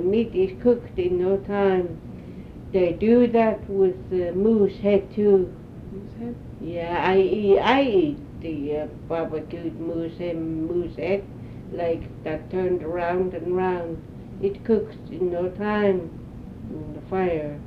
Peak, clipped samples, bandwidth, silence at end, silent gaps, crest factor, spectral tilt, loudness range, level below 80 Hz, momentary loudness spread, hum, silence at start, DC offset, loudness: -4 dBFS; under 0.1%; 6 kHz; 0 s; none; 20 dB; -8.5 dB/octave; 7 LU; -46 dBFS; 17 LU; none; 0 s; under 0.1%; -23 LUFS